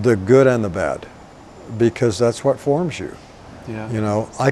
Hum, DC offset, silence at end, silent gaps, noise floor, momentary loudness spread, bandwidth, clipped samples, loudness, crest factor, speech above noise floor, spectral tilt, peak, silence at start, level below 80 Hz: none; under 0.1%; 0 s; none; -41 dBFS; 19 LU; 12 kHz; under 0.1%; -18 LUFS; 18 dB; 23 dB; -6.5 dB/octave; 0 dBFS; 0 s; -48 dBFS